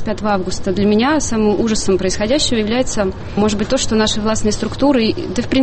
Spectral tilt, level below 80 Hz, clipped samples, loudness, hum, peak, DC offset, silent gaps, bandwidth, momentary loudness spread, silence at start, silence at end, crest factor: -4.5 dB/octave; -32 dBFS; under 0.1%; -16 LUFS; none; -4 dBFS; under 0.1%; none; 8.8 kHz; 5 LU; 0 s; 0 s; 12 dB